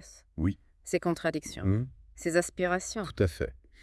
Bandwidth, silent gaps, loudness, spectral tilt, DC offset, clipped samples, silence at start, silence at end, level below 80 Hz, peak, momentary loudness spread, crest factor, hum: 12 kHz; none; -31 LUFS; -5.5 dB/octave; under 0.1%; under 0.1%; 0 s; 0.25 s; -50 dBFS; -12 dBFS; 9 LU; 20 dB; none